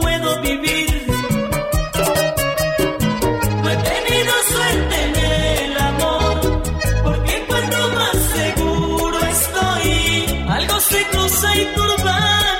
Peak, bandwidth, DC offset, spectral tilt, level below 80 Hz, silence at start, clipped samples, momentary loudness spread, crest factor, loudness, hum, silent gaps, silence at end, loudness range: -4 dBFS; 16.5 kHz; under 0.1%; -3.5 dB/octave; -26 dBFS; 0 s; under 0.1%; 5 LU; 14 dB; -17 LUFS; none; none; 0 s; 2 LU